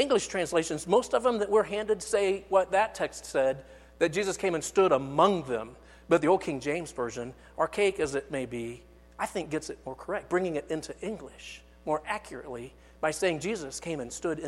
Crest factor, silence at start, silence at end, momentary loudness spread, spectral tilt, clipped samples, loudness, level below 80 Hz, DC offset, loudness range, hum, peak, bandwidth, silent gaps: 20 dB; 0 s; 0 s; 16 LU; -4.5 dB/octave; under 0.1%; -29 LUFS; -56 dBFS; under 0.1%; 7 LU; none; -8 dBFS; 13 kHz; none